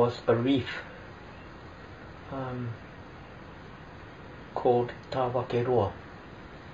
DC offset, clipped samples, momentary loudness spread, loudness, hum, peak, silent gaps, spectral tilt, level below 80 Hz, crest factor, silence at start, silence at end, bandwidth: under 0.1%; under 0.1%; 20 LU; -29 LUFS; none; -12 dBFS; none; -5.5 dB/octave; -56 dBFS; 20 dB; 0 s; 0 s; 7.6 kHz